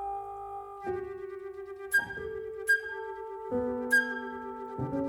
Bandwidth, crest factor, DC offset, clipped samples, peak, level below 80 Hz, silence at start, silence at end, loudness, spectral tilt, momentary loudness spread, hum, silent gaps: 19 kHz; 18 dB; under 0.1%; under 0.1%; -16 dBFS; -60 dBFS; 0 s; 0 s; -32 LUFS; -4.5 dB/octave; 15 LU; none; none